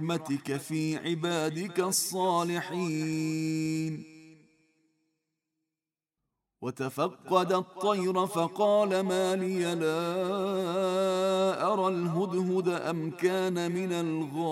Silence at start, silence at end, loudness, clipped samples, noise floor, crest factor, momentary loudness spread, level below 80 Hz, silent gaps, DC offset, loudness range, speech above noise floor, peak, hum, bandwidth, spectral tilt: 0 s; 0 s; -29 LUFS; under 0.1%; under -90 dBFS; 18 dB; 6 LU; -76 dBFS; none; under 0.1%; 9 LU; over 61 dB; -12 dBFS; none; 16 kHz; -5 dB/octave